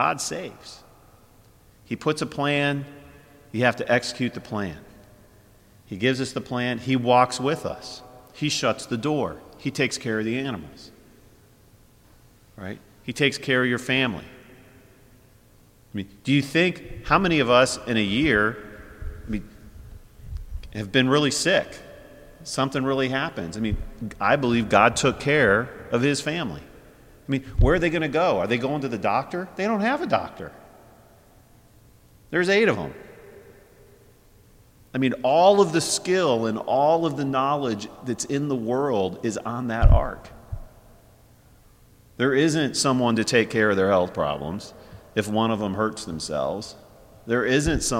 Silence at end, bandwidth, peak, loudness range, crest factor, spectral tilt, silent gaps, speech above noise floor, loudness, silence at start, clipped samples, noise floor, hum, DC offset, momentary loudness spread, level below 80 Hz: 0 s; 16.5 kHz; -2 dBFS; 6 LU; 22 dB; -4.5 dB/octave; none; 32 dB; -23 LUFS; 0 s; under 0.1%; -54 dBFS; none; under 0.1%; 19 LU; -36 dBFS